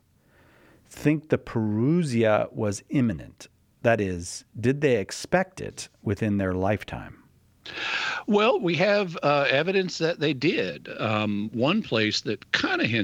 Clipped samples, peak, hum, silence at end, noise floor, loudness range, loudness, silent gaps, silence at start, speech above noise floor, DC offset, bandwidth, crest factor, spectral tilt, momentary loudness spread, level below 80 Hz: under 0.1%; -4 dBFS; none; 0 s; -60 dBFS; 4 LU; -25 LUFS; none; 0.9 s; 35 dB; under 0.1%; 15.5 kHz; 22 dB; -5.5 dB/octave; 11 LU; -56 dBFS